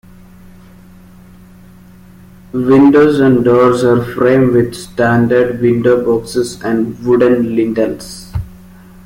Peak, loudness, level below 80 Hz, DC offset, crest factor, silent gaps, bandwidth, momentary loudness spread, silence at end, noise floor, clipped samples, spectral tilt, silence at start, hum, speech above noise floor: -2 dBFS; -12 LUFS; -40 dBFS; under 0.1%; 12 dB; none; 16 kHz; 14 LU; 0.5 s; -39 dBFS; under 0.1%; -7 dB/octave; 2.55 s; none; 28 dB